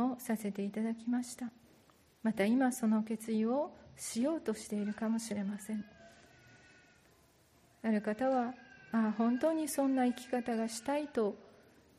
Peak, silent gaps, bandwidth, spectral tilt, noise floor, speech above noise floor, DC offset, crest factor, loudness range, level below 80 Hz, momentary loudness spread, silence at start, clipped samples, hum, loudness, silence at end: -20 dBFS; none; 14.5 kHz; -5.5 dB/octave; -67 dBFS; 33 dB; under 0.1%; 14 dB; 6 LU; -76 dBFS; 11 LU; 0 s; under 0.1%; none; -35 LUFS; 0.5 s